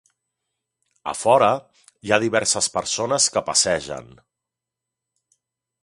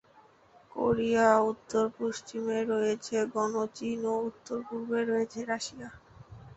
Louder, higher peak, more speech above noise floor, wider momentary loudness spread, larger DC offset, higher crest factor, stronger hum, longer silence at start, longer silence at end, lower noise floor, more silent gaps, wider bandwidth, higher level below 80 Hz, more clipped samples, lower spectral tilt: first, -20 LUFS vs -30 LUFS; first, 0 dBFS vs -10 dBFS; first, 65 dB vs 30 dB; first, 17 LU vs 12 LU; neither; about the same, 22 dB vs 22 dB; neither; first, 1.05 s vs 0.75 s; first, 1.8 s vs 0.05 s; first, -86 dBFS vs -60 dBFS; neither; first, 11.5 kHz vs 8.2 kHz; first, -58 dBFS vs -64 dBFS; neither; second, -2 dB/octave vs -5 dB/octave